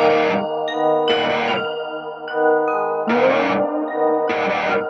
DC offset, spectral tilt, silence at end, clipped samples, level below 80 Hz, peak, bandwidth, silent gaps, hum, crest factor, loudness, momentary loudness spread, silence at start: under 0.1%; -5.5 dB/octave; 0 s; under 0.1%; -66 dBFS; -4 dBFS; 6.6 kHz; none; none; 14 dB; -19 LUFS; 8 LU; 0 s